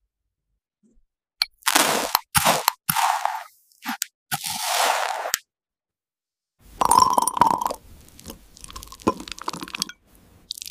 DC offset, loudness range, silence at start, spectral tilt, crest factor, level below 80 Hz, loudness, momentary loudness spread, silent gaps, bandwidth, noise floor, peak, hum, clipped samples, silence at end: under 0.1%; 5 LU; 1.4 s; -1.5 dB/octave; 26 dB; -54 dBFS; -22 LUFS; 18 LU; 4.14-4.26 s; 16 kHz; under -90 dBFS; 0 dBFS; none; under 0.1%; 0.2 s